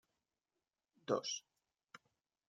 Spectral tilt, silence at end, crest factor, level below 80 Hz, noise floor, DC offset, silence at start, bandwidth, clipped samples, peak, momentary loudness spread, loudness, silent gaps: -3 dB/octave; 0.5 s; 26 dB; under -90 dBFS; under -90 dBFS; under 0.1%; 1.1 s; 11 kHz; under 0.1%; -22 dBFS; 23 LU; -41 LUFS; none